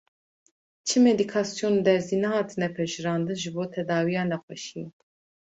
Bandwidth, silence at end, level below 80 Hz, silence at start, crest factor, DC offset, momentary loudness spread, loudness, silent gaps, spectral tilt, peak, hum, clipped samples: 8.2 kHz; 0.5 s; -68 dBFS; 0.85 s; 18 dB; under 0.1%; 15 LU; -26 LUFS; 4.43-4.48 s; -5 dB/octave; -8 dBFS; none; under 0.1%